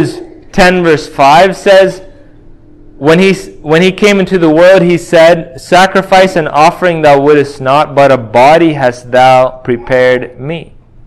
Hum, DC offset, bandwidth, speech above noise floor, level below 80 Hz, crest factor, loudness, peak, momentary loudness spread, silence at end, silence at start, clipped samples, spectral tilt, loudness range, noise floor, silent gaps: none; under 0.1%; 16 kHz; 28 dB; -36 dBFS; 8 dB; -7 LUFS; 0 dBFS; 9 LU; 0.45 s; 0 s; 4%; -5.5 dB/octave; 2 LU; -35 dBFS; none